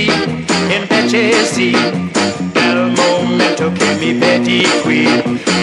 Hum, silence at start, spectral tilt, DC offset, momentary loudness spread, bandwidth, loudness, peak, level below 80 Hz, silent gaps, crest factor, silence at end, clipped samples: none; 0 s; -4 dB/octave; under 0.1%; 4 LU; 11.5 kHz; -12 LUFS; 0 dBFS; -50 dBFS; none; 12 dB; 0 s; under 0.1%